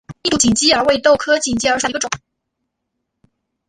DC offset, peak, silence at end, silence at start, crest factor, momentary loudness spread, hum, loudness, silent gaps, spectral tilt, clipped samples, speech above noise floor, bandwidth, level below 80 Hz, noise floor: under 0.1%; -2 dBFS; 1.5 s; 0.1 s; 16 dB; 9 LU; none; -15 LUFS; none; -2.5 dB/octave; under 0.1%; 60 dB; 11.5 kHz; -46 dBFS; -75 dBFS